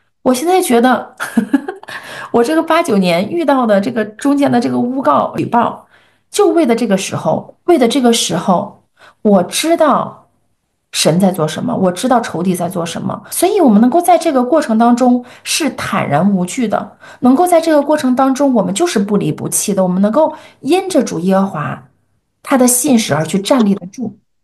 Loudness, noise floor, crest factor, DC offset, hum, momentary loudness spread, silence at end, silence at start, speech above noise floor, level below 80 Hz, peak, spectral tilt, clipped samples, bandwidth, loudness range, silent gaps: -13 LUFS; -65 dBFS; 12 dB; under 0.1%; none; 9 LU; 0.3 s; 0.25 s; 52 dB; -58 dBFS; 0 dBFS; -5 dB/octave; under 0.1%; 12.5 kHz; 2 LU; none